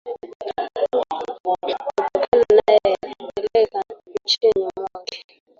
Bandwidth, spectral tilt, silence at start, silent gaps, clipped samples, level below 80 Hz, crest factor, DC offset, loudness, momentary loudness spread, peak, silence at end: 7.4 kHz; -3.5 dB/octave; 0.05 s; 0.35-0.40 s, 1.40-1.44 s, 2.28-2.32 s; under 0.1%; -56 dBFS; 20 dB; under 0.1%; -21 LUFS; 16 LU; -2 dBFS; 0.35 s